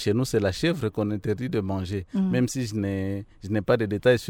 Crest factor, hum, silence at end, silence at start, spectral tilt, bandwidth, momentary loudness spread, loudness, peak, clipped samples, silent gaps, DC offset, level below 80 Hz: 18 dB; none; 0 s; 0 s; -6 dB/octave; 17 kHz; 6 LU; -26 LUFS; -6 dBFS; under 0.1%; none; under 0.1%; -52 dBFS